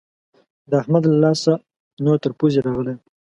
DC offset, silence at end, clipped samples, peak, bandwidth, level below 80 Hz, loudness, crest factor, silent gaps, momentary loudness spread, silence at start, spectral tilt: under 0.1%; 0.25 s; under 0.1%; -2 dBFS; 11 kHz; -56 dBFS; -19 LUFS; 18 dB; 1.76-1.97 s; 8 LU; 0.7 s; -7.5 dB/octave